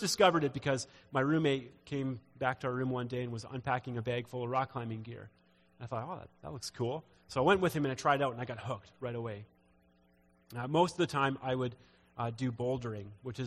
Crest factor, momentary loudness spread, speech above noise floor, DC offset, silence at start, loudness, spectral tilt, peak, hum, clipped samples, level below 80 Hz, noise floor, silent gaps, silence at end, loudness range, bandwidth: 24 dB; 14 LU; 34 dB; under 0.1%; 0 s; -34 LUFS; -5.5 dB/octave; -10 dBFS; none; under 0.1%; -66 dBFS; -68 dBFS; none; 0 s; 5 LU; 15 kHz